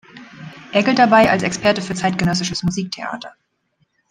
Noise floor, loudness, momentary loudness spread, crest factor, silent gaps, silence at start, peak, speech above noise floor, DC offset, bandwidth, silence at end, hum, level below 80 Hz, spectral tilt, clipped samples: -66 dBFS; -17 LUFS; 24 LU; 18 dB; none; 0.15 s; -2 dBFS; 49 dB; under 0.1%; 15.5 kHz; 0.8 s; none; -50 dBFS; -4.5 dB/octave; under 0.1%